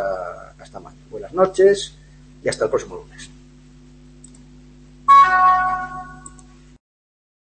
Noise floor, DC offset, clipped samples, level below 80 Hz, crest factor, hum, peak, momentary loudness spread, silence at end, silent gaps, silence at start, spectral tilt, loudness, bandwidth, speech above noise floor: -46 dBFS; under 0.1%; under 0.1%; -48 dBFS; 18 dB; none; -2 dBFS; 28 LU; 1.4 s; none; 0 s; -4 dB/octave; -17 LUFS; 8.8 kHz; 27 dB